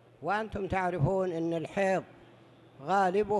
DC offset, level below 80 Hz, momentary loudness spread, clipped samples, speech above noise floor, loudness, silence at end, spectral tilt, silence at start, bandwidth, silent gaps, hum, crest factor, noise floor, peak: under 0.1%; -54 dBFS; 6 LU; under 0.1%; 27 dB; -30 LUFS; 0 s; -7 dB/octave; 0.2 s; 11.5 kHz; none; none; 16 dB; -56 dBFS; -16 dBFS